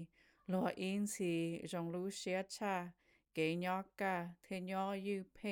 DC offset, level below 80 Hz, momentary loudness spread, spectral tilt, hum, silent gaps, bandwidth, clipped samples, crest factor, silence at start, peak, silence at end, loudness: under 0.1%; -78 dBFS; 8 LU; -5 dB/octave; none; none; 18.5 kHz; under 0.1%; 16 dB; 0 s; -24 dBFS; 0 s; -41 LUFS